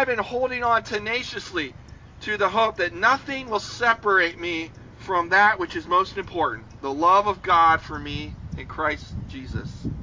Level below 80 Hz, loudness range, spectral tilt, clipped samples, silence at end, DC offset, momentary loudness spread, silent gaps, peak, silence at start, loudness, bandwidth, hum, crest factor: -44 dBFS; 3 LU; -4.5 dB/octave; under 0.1%; 0 s; under 0.1%; 16 LU; none; -6 dBFS; 0 s; -22 LUFS; 7.6 kHz; none; 18 dB